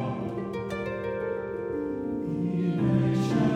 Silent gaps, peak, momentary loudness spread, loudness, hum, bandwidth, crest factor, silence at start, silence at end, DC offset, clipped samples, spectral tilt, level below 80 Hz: none; -14 dBFS; 8 LU; -29 LUFS; none; 10.5 kHz; 14 dB; 0 s; 0 s; under 0.1%; under 0.1%; -8.5 dB/octave; -54 dBFS